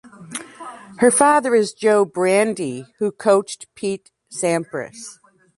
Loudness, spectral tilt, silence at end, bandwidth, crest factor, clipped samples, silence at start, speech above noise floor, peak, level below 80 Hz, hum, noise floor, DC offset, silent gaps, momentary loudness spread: -18 LUFS; -4 dB/octave; 0.45 s; 11.5 kHz; 20 dB; under 0.1%; 0.05 s; 19 dB; 0 dBFS; -64 dBFS; none; -38 dBFS; under 0.1%; none; 20 LU